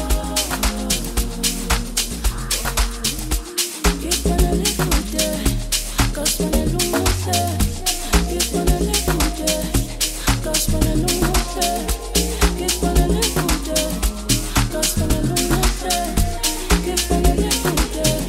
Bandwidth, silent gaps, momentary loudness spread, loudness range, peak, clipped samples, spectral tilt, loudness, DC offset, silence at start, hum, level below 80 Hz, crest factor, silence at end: 16.5 kHz; none; 4 LU; 2 LU; -2 dBFS; under 0.1%; -3.5 dB/octave; -19 LUFS; under 0.1%; 0 s; none; -24 dBFS; 18 dB; 0 s